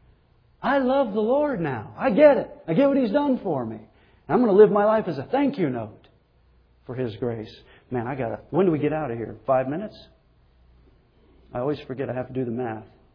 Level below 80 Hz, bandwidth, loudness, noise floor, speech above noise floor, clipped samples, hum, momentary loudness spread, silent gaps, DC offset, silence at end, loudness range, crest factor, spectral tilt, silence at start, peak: -56 dBFS; 5.4 kHz; -23 LUFS; -59 dBFS; 37 dB; under 0.1%; none; 16 LU; none; under 0.1%; 0.3 s; 10 LU; 20 dB; -10 dB/octave; 0.6 s; -4 dBFS